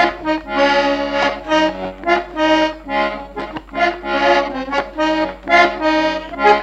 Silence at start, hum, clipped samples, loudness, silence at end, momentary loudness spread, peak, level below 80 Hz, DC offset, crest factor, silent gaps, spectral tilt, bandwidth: 0 s; none; under 0.1%; -17 LUFS; 0 s; 7 LU; 0 dBFS; -42 dBFS; under 0.1%; 16 dB; none; -4 dB/octave; 8.6 kHz